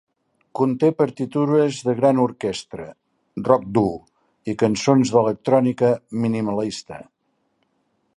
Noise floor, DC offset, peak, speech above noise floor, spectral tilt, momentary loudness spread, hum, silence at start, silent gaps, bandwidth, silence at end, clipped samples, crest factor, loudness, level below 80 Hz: -70 dBFS; under 0.1%; -2 dBFS; 50 dB; -6.5 dB/octave; 18 LU; none; 0.55 s; none; 11.5 kHz; 1.15 s; under 0.1%; 20 dB; -20 LUFS; -58 dBFS